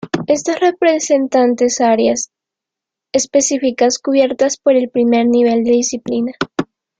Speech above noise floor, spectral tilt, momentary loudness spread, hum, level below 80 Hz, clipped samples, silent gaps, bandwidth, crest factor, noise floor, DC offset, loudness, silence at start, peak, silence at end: 70 dB; -3.5 dB/octave; 7 LU; none; -58 dBFS; under 0.1%; none; 9.4 kHz; 14 dB; -84 dBFS; under 0.1%; -15 LUFS; 0.05 s; 0 dBFS; 0.35 s